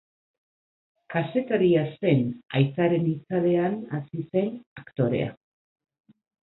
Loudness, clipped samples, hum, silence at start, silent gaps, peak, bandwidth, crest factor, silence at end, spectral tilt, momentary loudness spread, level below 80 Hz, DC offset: -25 LUFS; under 0.1%; none; 1.1 s; 4.66-4.76 s; -8 dBFS; 4.1 kHz; 18 dB; 1.15 s; -12 dB/octave; 10 LU; -62 dBFS; under 0.1%